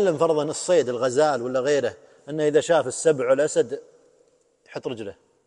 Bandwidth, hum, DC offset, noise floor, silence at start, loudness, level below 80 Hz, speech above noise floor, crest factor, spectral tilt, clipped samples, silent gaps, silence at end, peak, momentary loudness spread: 11.5 kHz; none; under 0.1%; -62 dBFS; 0 s; -22 LUFS; -70 dBFS; 40 dB; 16 dB; -4.5 dB/octave; under 0.1%; none; 0.35 s; -6 dBFS; 14 LU